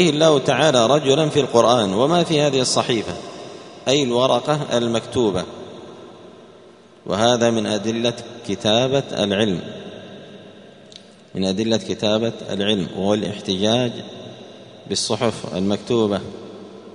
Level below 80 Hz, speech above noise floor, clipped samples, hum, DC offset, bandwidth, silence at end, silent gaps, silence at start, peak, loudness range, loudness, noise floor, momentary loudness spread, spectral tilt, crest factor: -56 dBFS; 28 dB; under 0.1%; none; under 0.1%; 10.5 kHz; 0.05 s; none; 0 s; 0 dBFS; 6 LU; -19 LUFS; -46 dBFS; 21 LU; -4.5 dB/octave; 20 dB